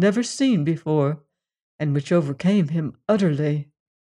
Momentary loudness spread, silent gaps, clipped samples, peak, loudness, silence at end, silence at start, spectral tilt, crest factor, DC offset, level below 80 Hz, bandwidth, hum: 8 LU; 1.62-1.79 s; under 0.1%; -6 dBFS; -22 LUFS; 0.35 s; 0 s; -7 dB/octave; 14 dB; under 0.1%; -66 dBFS; 11 kHz; none